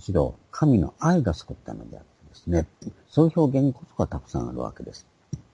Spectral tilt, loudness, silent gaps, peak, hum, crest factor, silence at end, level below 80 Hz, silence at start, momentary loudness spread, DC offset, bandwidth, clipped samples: -8 dB/octave; -24 LUFS; none; -6 dBFS; none; 20 dB; 0.15 s; -44 dBFS; 0.1 s; 19 LU; under 0.1%; 10 kHz; under 0.1%